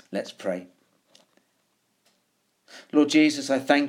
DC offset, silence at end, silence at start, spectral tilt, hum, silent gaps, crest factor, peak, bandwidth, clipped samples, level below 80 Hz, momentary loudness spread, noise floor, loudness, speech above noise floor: under 0.1%; 0 s; 0.1 s; -4 dB/octave; none; none; 22 dB; -4 dBFS; 12.5 kHz; under 0.1%; -84 dBFS; 14 LU; -71 dBFS; -24 LUFS; 48 dB